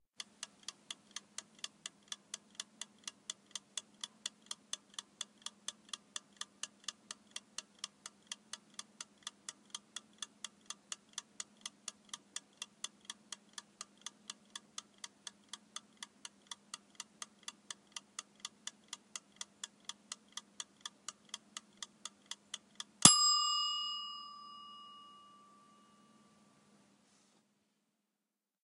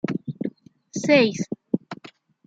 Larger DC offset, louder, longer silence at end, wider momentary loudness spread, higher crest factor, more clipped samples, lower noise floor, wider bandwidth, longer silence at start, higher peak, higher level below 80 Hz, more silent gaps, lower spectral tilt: neither; second, -39 LUFS vs -23 LUFS; first, 3.45 s vs 0.4 s; second, 8 LU vs 18 LU; first, 40 dB vs 22 dB; neither; first, -90 dBFS vs -48 dBFS; first, 15 kHz vs 9 kHz; about the same, 0.2 s vs 0.1 s; about the same, -2 dBFS vs -4 dBFS; second, -82 dBFS vs -68 dBFS; neither; second, -0.5 dB/octave vs -5 dB/octave